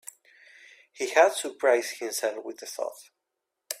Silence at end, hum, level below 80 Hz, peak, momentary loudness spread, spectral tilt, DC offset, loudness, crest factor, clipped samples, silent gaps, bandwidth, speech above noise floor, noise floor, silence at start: 0 s; none; -82 dBFS; -6 dBFS; 16 LU; 0 dB/octave; under 0.1%; -27 LUFS; 24 dB; under 0.1%; none; 16 kHz; 58 dB; -84 dBFS; 0.95 s